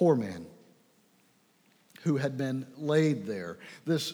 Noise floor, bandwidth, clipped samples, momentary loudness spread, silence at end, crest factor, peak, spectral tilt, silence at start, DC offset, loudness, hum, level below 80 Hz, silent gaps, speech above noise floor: -66 dBFS; over 20 kHz; under 0.1%; 15 LU; 0 s; 18 dB; -14 dBFS; -6.5 dB/octave; 0 s; under 0.1%; -31 LUFS; none; -78 dBFS; none; 37 dB